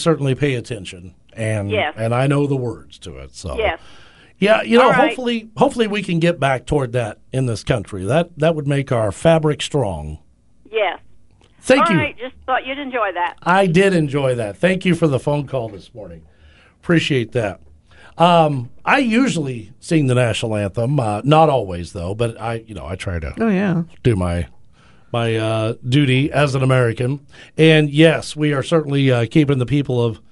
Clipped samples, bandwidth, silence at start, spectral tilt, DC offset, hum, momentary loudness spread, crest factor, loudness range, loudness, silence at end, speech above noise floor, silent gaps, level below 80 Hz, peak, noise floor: under 0.1%; 11.5 kHz; 0 s; -6.5 dB/octave; under 0.1%; none; 15 LU; 18 dB; 5 LU; -18 LUFS; 0.15 s; 32 dB; none; -40 dBFS; 0 dBFS; -49 dBFS